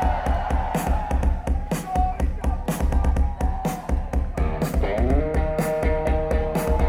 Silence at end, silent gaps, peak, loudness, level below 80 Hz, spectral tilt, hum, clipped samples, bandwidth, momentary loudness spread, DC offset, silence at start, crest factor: 0 s; none; -8 dBFS; -24 LUFS; -24 dBFS; -7 dB/octave; none; under 0.1%; 16 kHz; 4 LU; under 0.1%; 0 s; 14 dB